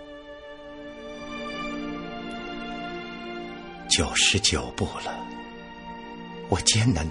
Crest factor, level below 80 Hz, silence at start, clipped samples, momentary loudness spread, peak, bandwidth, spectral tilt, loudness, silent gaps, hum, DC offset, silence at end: 24 dB; -44 dBFS; 0 s; under 0.1%; 21 LU; -4 dBFS; 11 kHz; -3 dB/octave; -26 LUFS; none; none; under 0.1%; 0 s